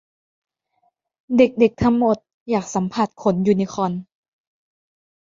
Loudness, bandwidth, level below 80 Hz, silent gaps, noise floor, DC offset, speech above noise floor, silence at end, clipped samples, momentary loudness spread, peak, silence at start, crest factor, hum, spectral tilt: -20 LUFS; 7.6 kHz; -50 dBFS; 2.34-2.46 s; -68 dBFS; under 0.1%; 49 dB; 1.2 s; under 0.1%; 8 LU; -2 dBFS; 1.3 s; 20 dB; none; -7 dB/octave